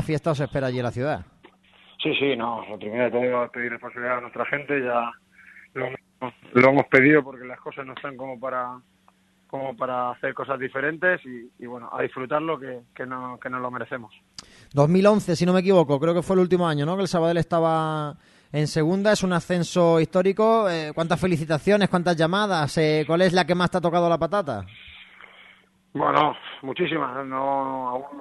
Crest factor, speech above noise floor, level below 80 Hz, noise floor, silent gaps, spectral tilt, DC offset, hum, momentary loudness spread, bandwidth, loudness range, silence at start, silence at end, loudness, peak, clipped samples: 22 dB; 38 dB; -56 dBFS; -61 dBFS; none; -6 dB/octave; under 0.1%; none; 16 LU; 12 kHz; 7 LU; 0 s; 0 s; -23 LUFS; 0 dBFS; under 0.1%